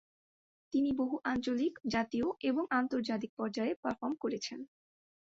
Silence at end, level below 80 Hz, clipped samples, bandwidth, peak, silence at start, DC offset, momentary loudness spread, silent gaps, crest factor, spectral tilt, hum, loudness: 0.55 s; -68 dBFS; under 0.1%; 7.8 kHz; -18 dBFS; 0.7 s; under 0.1%; 6 LU; 3.29-3.37 s, 3.76-3.83 s; 18 dB; -5 dB/octave; none; -35 LUFS